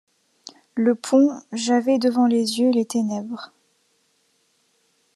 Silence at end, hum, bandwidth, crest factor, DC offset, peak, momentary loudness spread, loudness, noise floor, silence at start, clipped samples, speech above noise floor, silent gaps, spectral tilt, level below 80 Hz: 1.7 s; none; 12.5 kHz; 18 dB; under 0.1%; -6 dBFS; 14 LU; -21 LUFS; -66 dBFS; 0.45 s; under 0.1%; 46 dB; none; -4.5 dB/octave; -80 dBFS